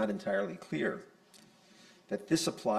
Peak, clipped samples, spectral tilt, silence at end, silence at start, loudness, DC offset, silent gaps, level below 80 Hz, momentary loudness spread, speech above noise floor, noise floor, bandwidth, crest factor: -16 dBFS; under 0.1%; -4.5 dB/octave; 0 s; 0 s; -34 LUFS; under 0.1%; none; -72 dBFS; 10 LU; 27 dB; -61 dBFS; 14.5 kHz; 20 dB